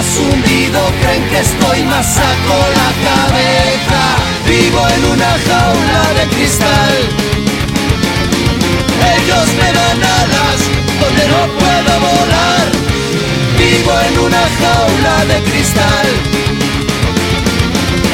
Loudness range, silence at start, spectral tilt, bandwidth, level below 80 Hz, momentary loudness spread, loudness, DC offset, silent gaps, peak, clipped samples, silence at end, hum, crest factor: 1 LU; 0 s; -4 dB/octave; 17 kHz; -24 dBFS; 4 LU; -10 LUFS; under 0.1%; none; 0 dBFS; under 0.1%; 0 s; none; 10 dB